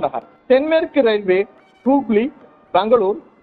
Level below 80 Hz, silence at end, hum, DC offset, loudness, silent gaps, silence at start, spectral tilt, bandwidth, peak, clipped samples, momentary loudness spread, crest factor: -56 dBFS; 0.2 s; none; under 0.1%; -17 LUFS; none; 0 s; -9 dB/octave; 4.6 kHz; -2 dBFS; under 0.1%; 10 LU; 16 dB